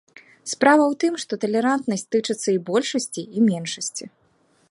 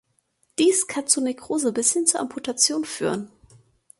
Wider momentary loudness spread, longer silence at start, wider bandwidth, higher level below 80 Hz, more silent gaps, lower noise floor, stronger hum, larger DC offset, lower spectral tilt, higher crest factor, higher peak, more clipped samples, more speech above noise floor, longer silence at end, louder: about the same, 12 LU vs 10 LU; second, 0.45 s vs 0.6 s; about the same, 11.5 kHz vs 12 kHz; second, -72 dBFS vs -66 dBFS; neither; second, -62 dBFS vs -68 dBFS; neither; neither; first, -4 dB/octave vs -2 dB/octave; about the same, 20 dB vs 22 dB; about the same, -2 dBFS vs -2 dBFS; neither; second, 41 dB vs 45 dB; about the same, 0.6 s vs 0.7 s; about the same, -22 LUFS vs -22 LUFS